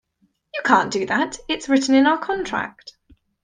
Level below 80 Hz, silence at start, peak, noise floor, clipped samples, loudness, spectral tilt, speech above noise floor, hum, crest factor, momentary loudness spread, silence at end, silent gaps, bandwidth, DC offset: -56 dBFS; 0.55 s; -2 dBFS; -66 dBFS; under 0.1%; -20 LUFS; -3.5 dB/octave; 47 dB; none; 20 dB; 11 LU; 0.55 s; none; 9.8 kHz; under 0.1%